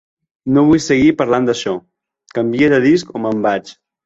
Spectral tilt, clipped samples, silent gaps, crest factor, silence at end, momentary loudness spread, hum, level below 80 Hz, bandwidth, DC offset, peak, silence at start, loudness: -6 dB/octave; under 0.1%; none; 14 dB; 0.35 s; 11 LU; none; -48 dBFS; 8 kHz; under 0.1%; -2 dBFS; 0.45 s; -15 LUFS